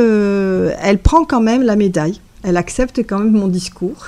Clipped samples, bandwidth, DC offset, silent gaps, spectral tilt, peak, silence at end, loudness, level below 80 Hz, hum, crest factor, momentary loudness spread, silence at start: under 0.1%; 11.5 kHz; under 0.1%; none; -6.5 dB/octave; 0 dBFS; 0 s; -15 LUFS; -26 dBFS; none; 14 dB; 7 LU; 0 s